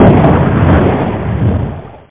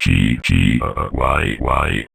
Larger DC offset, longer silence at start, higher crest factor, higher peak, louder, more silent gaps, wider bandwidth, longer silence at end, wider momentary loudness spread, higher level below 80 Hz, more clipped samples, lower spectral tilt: first, 2% vs under 0.1%; about the same, 0 s vs 0 s; second, 10 dB vs 16 dB; about the same, 0 dBFS vs -2 dBFS; first, -11 LUFS vs -17 LUFS; neither; second, 4 kHz vs 14.5 kHz; about the same, 0.1 s vs 0.1 s; first, 11 LU vs 4 LU; about the same, -20 dBFS vs -24 dBFS; neither; first, -12.5 dB/octave vs -6 dB/octave